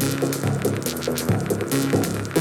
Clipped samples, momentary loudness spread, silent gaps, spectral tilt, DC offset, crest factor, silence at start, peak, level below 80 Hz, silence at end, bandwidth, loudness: under 0.1%; 3 LU; none; -5 dB/octave; under 0.1%; 16 dB; 0 s; -8 dBFS; -50 dBFS; 0 s; 18.5 kHz; -23 LUFS